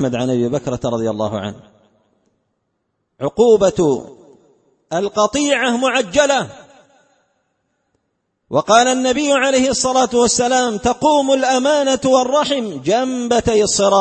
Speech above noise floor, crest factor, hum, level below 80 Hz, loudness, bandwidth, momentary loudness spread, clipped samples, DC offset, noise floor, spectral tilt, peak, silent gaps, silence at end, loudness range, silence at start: 55 dB; 16 dB; none; -46 dBFS; -16 LUFS; 8.8 kHz; 8 LU; under 0.1%; under 0.1%; -71 dBFS; -3.5 dB/octave; 0 dBFS; none; 0 s; 5 LU; 0 s